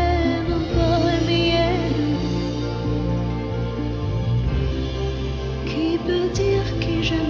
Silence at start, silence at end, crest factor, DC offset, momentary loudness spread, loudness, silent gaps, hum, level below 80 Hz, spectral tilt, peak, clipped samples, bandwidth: 0 s; 0 s; 14 dB; under 0.1%; 7 LU; -22 LUFS; none; none; -30 dBFS; -7 dB/octave; -8 dBFS; under 0.1%; 7.4 kHz